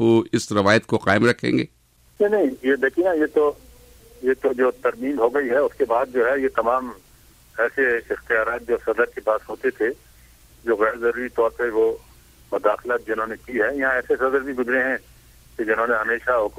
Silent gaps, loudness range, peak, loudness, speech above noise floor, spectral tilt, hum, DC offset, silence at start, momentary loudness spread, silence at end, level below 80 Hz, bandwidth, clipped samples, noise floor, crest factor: none; 3 LU; -4 dBFS; -21 LUFS; 31 dB; -5.5 dB/octave; none; under 0.1%; 0 s; 8 LU; 0 s; -52 dBFS; 16 kHz; under 0.1%; -52 dBFS; 18 dB